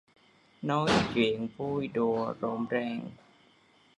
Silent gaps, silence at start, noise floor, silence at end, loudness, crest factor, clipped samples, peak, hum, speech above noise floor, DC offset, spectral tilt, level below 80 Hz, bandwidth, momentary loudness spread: none; 0.6 s; -63 dBFS; 0.85 s; -30 LUFS; 18 dB; under 0.1%; -12 dBFS; none; 33 dB; under 0.1%; -6 dB/octave; -60 dBFS; 11 kHz; 11 LU